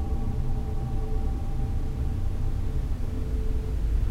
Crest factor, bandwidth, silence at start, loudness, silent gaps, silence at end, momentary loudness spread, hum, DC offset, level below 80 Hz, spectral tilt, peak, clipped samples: 12 dB; 7.6 kHz; 0 s; -31 LUFS; none; 0 s; 1 LU; none; under 0.1%; -26 dBFS; -8 dB/octave; -14 dBFS; under 0.1%